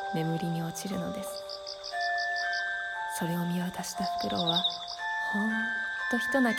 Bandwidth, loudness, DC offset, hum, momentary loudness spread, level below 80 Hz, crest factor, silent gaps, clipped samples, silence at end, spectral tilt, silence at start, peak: 17.5 kHz; -31 LUFS; under 0.1%; none; 8 LU; -64 dBFS; 16 dB; none; under 0.1%; 0 s; -4 dB/octave; 0 s; -14 dBFS